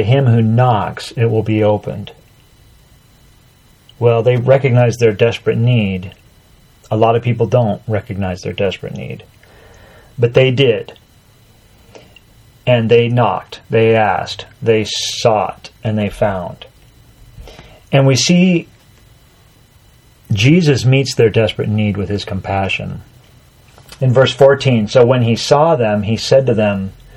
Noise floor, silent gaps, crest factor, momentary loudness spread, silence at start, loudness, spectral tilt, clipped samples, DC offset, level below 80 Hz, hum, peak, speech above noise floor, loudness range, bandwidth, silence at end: -48 dBFS; none; 14 dB; 12 LU; 0 s; -14 LUFS; -6 dB/octave; under 0.1%; under 0.1%; -46 dBFS; none; 0 dBFS; 35 dB; 5 LU; 12 kHz; 0.25 s